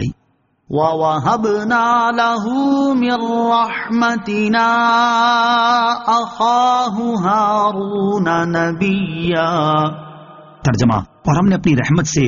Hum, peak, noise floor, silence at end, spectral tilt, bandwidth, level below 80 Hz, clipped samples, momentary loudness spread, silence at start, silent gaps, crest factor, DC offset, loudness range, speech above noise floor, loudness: none; -2 dBFS; -61 dBFS; 0 s; -4.5 dB/octave; 7.2 kHz; -44 dBFS; under 0.1%; 5 LU; 0 s; none; 14 dB; under 0.1%; 3 LU; 46 dB; -15 LUFS